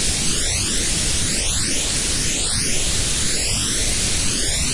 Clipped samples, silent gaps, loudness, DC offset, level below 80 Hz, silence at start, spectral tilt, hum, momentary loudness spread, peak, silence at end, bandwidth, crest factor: under 0.1%; none; -18 LUFS; under 0.1%; -28 dBFS; 0 s; -1.5 dB/octave; none; 0 LU; -6 dBFS; 0 s; 11.5 kHz; 12 dB